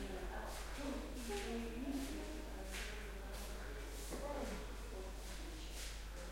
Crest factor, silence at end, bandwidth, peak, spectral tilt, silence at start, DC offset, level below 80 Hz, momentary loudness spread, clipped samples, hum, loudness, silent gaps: 14 dB; 0 s; 16.5 kHz; -32 dBFS; -4 dB/octave; 0 s; under 0.1%; -50 dBFS; 5 LU; under 0.1%; none; -47 LUFS; none